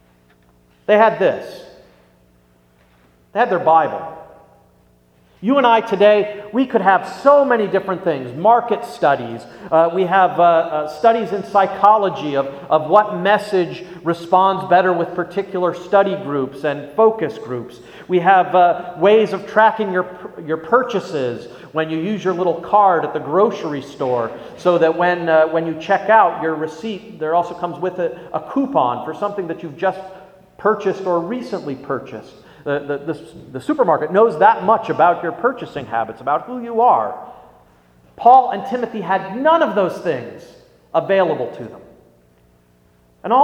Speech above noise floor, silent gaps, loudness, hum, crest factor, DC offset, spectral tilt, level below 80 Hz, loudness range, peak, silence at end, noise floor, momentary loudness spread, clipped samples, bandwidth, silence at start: 38 dB; none; -17 LUFS; 60 Hz at -55 dBFS; 18 dB; under 0.1%; -6.5 dB/octave; -60 dBFS; 6 LU; 0 dBFS; 0 s; -54 dBFS; 13 LU; under 0.1%; 11.5 kHz; 0.9 s